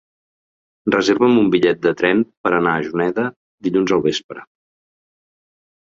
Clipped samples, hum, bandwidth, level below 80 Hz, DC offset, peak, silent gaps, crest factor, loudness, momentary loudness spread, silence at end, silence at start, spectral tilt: under 0.1%; none; 7.6 kHz; -58 dBFS; under 0.1%; -2 dBFS; 2.37-2.44 s, 3.36-3.58 s, 4.24-4.29 s; 18 dB; -18 LUFS; 12 LU; 1.5 s; 0.85 s; -5.5 dB/octave